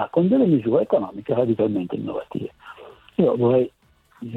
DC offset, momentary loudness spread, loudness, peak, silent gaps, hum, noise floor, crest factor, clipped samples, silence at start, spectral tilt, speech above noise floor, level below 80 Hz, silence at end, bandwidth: under 0.1%; 14 LU; -21 LUFS; -6 dBFS; none; none; -43 dBFS; 16 dB; under 0.1%; 0 s; -10.5 dB/octave; 22 dB; -60 dBFS; 0 s; 4.2 kHz